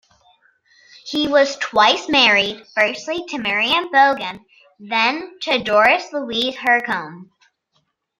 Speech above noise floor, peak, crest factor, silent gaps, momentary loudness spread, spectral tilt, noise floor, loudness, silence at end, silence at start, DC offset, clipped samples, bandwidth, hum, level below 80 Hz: 50 dB; 0 dBFS; 18 dB; none; 12 LU; -2.5 dB/octave; -68 dBFS; -17 LUFS; 0.95 s; 1.05 s; under 0.1%; under 0.1%; 15.5 kHz; none; -60 dBFS